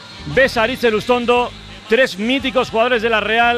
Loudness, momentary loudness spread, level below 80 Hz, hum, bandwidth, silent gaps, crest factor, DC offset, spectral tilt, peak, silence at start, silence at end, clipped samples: -16 LUFS; 4 LU; -42 dBFS; none; 15 kHz; none; 12 dB; under 0.1%; -4.5 dB/octave; -4 dBFS; 0 s; 0 s; under 0.1%